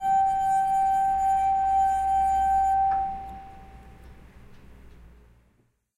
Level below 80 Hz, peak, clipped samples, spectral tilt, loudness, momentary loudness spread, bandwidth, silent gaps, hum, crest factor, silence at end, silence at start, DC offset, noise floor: -46 dBFS; -16 dBFS; under 0.1%; -4 dB/octave; -23 LUFS; 9 LU; 12.5 kHz; none; none; 10 dB; 1.1 s; 0 s; under 0.1%; -67 dBFS